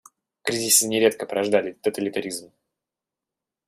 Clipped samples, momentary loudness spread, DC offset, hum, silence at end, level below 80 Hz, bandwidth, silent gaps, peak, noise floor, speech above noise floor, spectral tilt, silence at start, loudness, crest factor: under 0.1%; 13 LU; under 0.1%; none; 1.25 s; -70 dBFS; 15.5 kHz; none; -4 dBFS; -88 dBFS; 65 dB; -2 dB/octave; 0.45 s; -22 LUFS; 22 dB